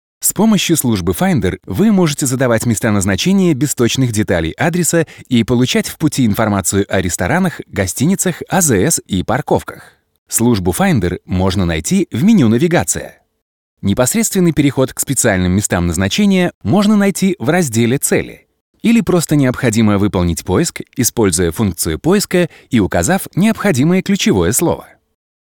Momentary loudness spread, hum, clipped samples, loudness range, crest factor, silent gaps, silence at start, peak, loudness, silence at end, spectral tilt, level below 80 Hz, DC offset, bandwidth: 5 LU; none; under 0.1%; 2 LU; 14 dB; 10.18-10.26 s, 13.42-13.77 s, 16.55-16.61 s, 18.61-18.74 s; 0.2 s; 0 dBFS; -14 LUFS; 0.6 s; -5 dB/octave; -42 dBFS; under 0.1%; 19 kHz